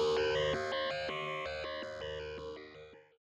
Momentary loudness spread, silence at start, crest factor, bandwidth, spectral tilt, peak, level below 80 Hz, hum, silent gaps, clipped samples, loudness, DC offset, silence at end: 18 LU; 0 s; 14 dB; 10.5 kHz; -4 dB/octave; -22 dBFS; -60 dBFS; none; none; under 0.1%; -37 LUFS; under 0.1%; 0.4 s